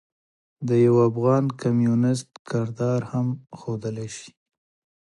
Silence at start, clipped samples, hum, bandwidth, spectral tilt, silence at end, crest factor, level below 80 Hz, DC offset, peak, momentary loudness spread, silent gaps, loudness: 0.6 s; under 0.1%; none; 11.5 kHz; -8 dB/octave; 0.8 s; 16 dB; -62 dBFS; under 0.1%; -8 dBFS; 15 LU; 2.39-2.45 s; -23 LUFS